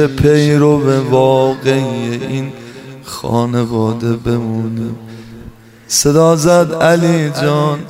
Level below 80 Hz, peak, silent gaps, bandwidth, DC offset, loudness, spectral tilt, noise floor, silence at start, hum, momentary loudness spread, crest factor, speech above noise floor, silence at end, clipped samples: -40 dBFS; 0 dBFS; none; 16 kHz; under 0.1%; -13 LUFS; -5.5 dB/octave; -36 dBFS; 0 s; none; 17 LU; 12 dB; 24 dB; 0 s; under 0.1%